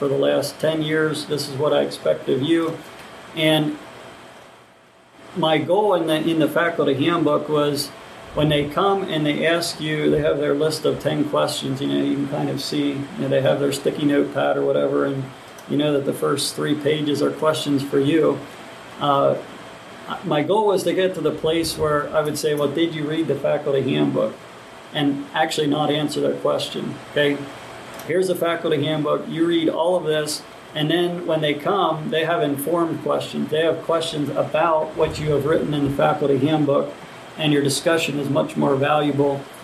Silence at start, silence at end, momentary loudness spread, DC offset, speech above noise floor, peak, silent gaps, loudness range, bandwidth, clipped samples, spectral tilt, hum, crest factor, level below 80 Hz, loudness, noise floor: 0 s; 0 s; 10 LU; under 0.1%; 30 dB; -4 dBFS; none; 2 LU; 13.5 kHz; under 0.1%; -5.5 dB/octave; none; 18 dB; -54 dBFS; -21 LUFS; -51 dBFS